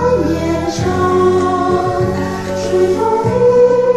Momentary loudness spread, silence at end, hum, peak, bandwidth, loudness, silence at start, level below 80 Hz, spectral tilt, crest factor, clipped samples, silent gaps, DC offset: 7 LU; 0 s; none; 0 dBFS; 13 kHz; -14 LUFS; 0 s; -36 dBFS; -6.5 dB/octave; 12 dB; under 0.1%; none; 0.5%